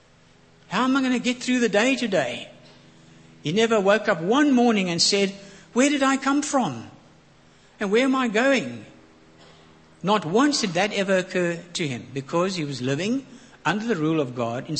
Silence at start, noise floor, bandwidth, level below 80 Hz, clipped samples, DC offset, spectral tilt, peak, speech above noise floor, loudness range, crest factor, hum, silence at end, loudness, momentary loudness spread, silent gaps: 0.7 s; -55 dBFS; 8.8 kHz; -66 dBFS; under 0.1%; under 0.1%; -4 dB/octave; -4 dBFS; 32 dB; 5 LU; 20 dB; none; 0 s; -22 LUFS; 10 LU; none